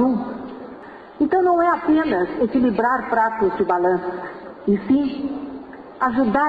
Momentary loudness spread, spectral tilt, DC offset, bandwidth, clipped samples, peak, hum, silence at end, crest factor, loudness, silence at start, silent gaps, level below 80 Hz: 17 LU; -8.5 dB/octave; under 0.1%; 5 kHz; under 0.1%; -8 dBFS; none; 0 s; 12 dB; -20 LUFS; 0 s; none; -52 dBFS